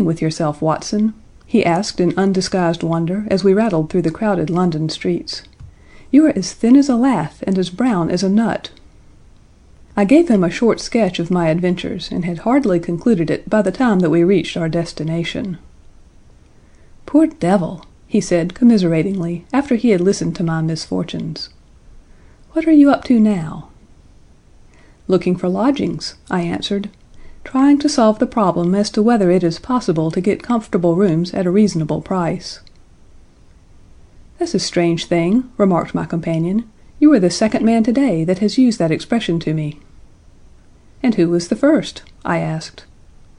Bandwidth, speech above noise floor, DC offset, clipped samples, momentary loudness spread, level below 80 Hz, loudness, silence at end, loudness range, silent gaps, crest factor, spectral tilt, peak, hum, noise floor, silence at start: 11 kHz; 30 dB; under 0.1%; under 0.1%; 10 LU; -44 dBFS; -16 LUFS; 0.6 s; 5 LU; none; 16 dB; -6.5 dB/octave; -2 dBFS; none; -46 dBFS; 0 s